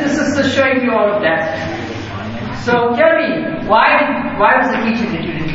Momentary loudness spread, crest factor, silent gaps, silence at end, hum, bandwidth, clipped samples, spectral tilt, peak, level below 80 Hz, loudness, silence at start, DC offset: 12 LU; 14 dB; none; 0 s; none; 8 kHz; under 0.1%; -5.5 dB/octave; 0 dBFS; -42 dBFS; -14 LUFS; 0 s; under 0.1%